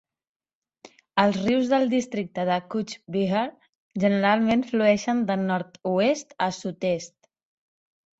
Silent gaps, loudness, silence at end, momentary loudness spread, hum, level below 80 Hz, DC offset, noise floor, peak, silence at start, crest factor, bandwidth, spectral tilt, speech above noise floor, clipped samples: 3.69-3.90 s; -24 LUFS; 1.1 s; 9 LU; none; -64 dBFS; under 0.1%; -88 dBFS; -6 dBFS; 1.15 s; 20 dB; 8 kHz; -5.5 dB/octave; 65 dB; under 0.1%